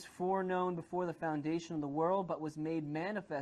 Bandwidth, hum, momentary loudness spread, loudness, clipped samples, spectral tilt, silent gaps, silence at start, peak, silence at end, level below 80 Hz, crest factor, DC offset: 12 kHz; none; 5 LU; -37 LUFS; under 0.1%; -7 dB/octave; none; 0 s; -22 dBFS; 0 s; -74 dBFS; 14 dB; under 0.1%